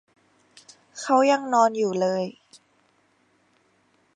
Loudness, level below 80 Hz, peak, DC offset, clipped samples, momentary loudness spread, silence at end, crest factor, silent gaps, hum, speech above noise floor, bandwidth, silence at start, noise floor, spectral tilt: -22 LUFS; -80 dBFS; -6 dBFS; under 0.1%; under 0.1%; 15 LU; 1.85 s; 20 dB; none; none; 43 dB; 10.5 kHz; 0.95 s; -65 dBFS; -4.5 dB/octave